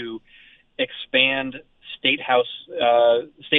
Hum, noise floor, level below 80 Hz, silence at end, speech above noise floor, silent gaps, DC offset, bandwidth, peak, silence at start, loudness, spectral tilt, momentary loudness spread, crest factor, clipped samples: none; -52 dBFS; -62 dBFS; 0 s; 31 dB; none; under 0.1%; 4 kHz; -2 dBFS; 0 s; -20 LUFS; -7 dB/octave; 21 LU; 20 dB; under 0.1%